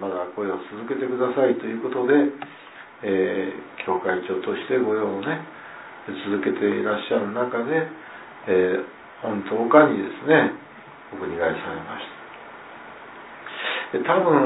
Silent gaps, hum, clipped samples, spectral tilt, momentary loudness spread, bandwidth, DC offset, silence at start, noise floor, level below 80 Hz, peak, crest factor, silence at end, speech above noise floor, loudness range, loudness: none; none; under 0.1%; -10 dB/octave; 21 LU; 4 kHz; under 0.1%; 0 s; -43 dBFS; -66 dBFS; -2 dBFS; 22 dB; 0 s; 21 dB; 5 LU; -23 LUFS